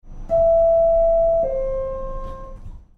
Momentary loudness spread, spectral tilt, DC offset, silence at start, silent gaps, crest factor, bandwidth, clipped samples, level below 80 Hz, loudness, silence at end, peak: 18 LU; -9 dB/octave; under 0.1%; 0.05 s; none; 10 dB; 2.8 kHz; under 0.1%; -32 dBFS; -18 LUFS; 0.2 s; -10 dBFS